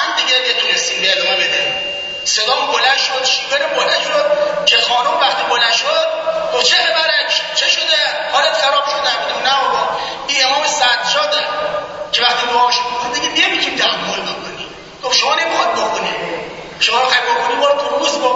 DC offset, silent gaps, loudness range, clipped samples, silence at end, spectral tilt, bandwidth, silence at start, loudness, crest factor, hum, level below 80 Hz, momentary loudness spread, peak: under 0.1%; none; 3 LU; under 0.1%; 0 s; 0 dB/octave; 8 kHz; 0 s; -14 LUFS; 16 dB; none; -54 dBFS; 8 LU; 0 dBFS